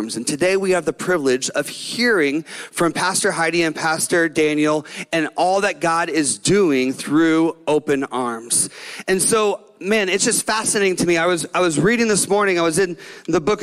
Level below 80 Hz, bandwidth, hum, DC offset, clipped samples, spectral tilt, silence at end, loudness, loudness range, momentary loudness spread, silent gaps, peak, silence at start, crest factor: -54 dBFS; 15.5 kHz; none; under 0.1%; under 0.1%; -3.5 dB/octave; 0 s; -18 LUFS; 2 LU; 7 LU; none; -6 dBFS; 0 s; 12 dB